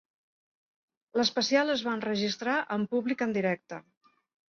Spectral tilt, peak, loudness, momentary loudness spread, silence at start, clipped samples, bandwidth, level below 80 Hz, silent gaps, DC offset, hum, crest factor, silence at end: -4 dB/octave; -12 dBFS; -29 LUFS; 9 LU; 1.15 s; under 0.1%; 7.2 kHz; -74 dBFS; none; under 0.1%; none; 18 dB; 0.7 s